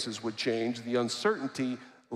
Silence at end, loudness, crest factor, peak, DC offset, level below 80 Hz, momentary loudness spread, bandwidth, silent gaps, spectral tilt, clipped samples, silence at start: 0 s; -32 LUFS; 16 dB; -16 dBFS; under 0.1%; -80 dBFS; 6 LU; 13 kHz; none; -4 dB/octave; under 0.1%; 0 s